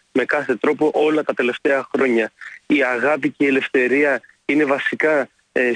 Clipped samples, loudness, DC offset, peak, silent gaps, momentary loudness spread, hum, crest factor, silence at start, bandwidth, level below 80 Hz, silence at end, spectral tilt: under 0.1%; -19 LUFS; under 0.1%; -6 dBFS; none; 4 LU; none; 12 dB; 0.15 s; 10 kHz; -66 dBFS; 0 s; -5.5 dB/octave